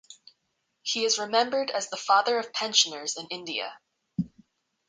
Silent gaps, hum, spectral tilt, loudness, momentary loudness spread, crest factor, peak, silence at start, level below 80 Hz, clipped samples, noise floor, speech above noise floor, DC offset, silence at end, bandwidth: none; none; -1.5 dB/octave; -26 LUFS; 13 LU; 22 dB; -8 dBFS; 0.1 s; -70 dBFS; under 0.1%; -77 dBFS; 50 dB; under 0.1%; 0.6 s; 10 kHz